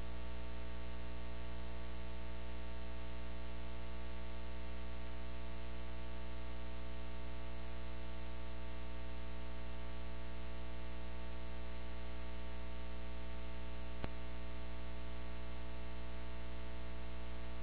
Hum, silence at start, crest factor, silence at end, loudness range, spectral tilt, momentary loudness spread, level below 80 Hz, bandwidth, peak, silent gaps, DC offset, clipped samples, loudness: 60 Hz at -50 dBFS; 0 s; 24 dB; 0 s; 0 LU; -5 dB/octave; 0 LU; -48 dBFS; 4.9 kHz; -22 dBFS; none; 1%; under 0.1%; -49 LUFS